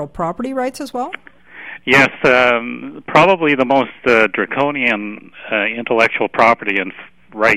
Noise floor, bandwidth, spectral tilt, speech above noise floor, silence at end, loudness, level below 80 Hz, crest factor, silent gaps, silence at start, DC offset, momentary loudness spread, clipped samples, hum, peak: -35 dBFS; 15.5 kHz; -5 dB/octave; 20 dB; 0 s; -15 LUFS; -50 dBFS; 16 dB; none; 0 s; 0.4%; 16 LU; under 0.1%; none; 0 dBFS